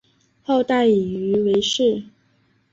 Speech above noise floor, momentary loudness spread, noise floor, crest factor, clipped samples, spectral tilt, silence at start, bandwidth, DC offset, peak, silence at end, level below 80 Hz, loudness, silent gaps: 43 dB; 7 LU; -62 dBFS; 14 dB; under 0.1%; -5 dB/octave; 0.5 s; 7.8 kHz; under 0.1%; -8 dBFS; 0.7 s; -58 dBFS; -19 LUFS; none